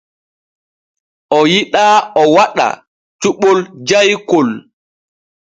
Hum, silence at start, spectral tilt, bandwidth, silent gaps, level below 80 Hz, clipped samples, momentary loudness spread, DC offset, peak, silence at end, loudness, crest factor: none; 1.3 s; -4 dB/octave; 9.2 kHz; 2.87-3.19 s; -60 dBFS; under 0.1%; 8 LU; under 0.1%; 0 dBFS; 0.8 s; -12 LUFS; 14 dB